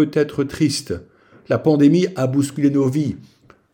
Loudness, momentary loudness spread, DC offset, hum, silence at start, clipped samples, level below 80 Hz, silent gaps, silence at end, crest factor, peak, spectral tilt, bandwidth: -18 LUFS; 12 LU; under 0.1%; none; 0 s; under 0.1%; -54 dBFS; none; 0.55 s; 16 dB; -4 dBFS; -6.5 dB/octave; 16.5 kHz